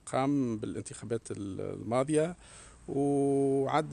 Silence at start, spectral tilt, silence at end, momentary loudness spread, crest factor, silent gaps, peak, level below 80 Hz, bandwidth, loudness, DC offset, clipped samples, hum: 0.05 s; -6.5 dB/octave; 0 s; 12 LU; 18 dB; none; -14 dBFS; -60 dBFS; 10.5 kHz; -31 LUFS; under 0.1%; under 0.1%; none